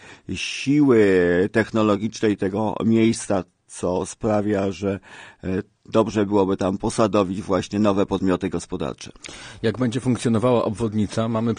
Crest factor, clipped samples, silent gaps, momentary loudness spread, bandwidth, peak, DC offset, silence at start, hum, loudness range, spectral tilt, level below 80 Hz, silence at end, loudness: 18 dB; under 0.1%; none; 11 LU; 10 kHz; -4 dBFS; under 0.1%; 0 s; none; 4 LU; -6 dB/octave; -50 dBFS; 0 s; -22 LUFS